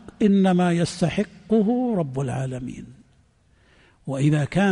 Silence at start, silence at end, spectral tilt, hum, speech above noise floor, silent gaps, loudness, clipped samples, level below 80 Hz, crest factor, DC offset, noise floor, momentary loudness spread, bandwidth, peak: 0.05 s; 0 s; -7 dB/octave; none; 38 dB; none; -22 LUFS; under 0.1%; -52 dBFS; 14 dB; under 0.1%; -59 dBFS; 14 LU; 10.5 kHz; -8 dBFS